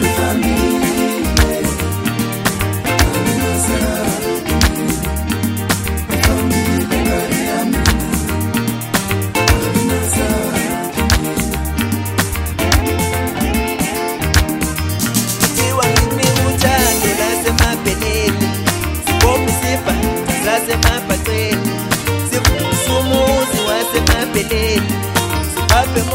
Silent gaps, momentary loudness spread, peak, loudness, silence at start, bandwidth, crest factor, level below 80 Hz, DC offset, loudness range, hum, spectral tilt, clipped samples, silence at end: none; 5 LU; 0 dBFS; -15 LUFS; 0 s; 16.5 kHz; 16 dB; -24 dBFS; under 0.1%; 3 LU; none; -4 dB/octave; under 0.1%; 0 s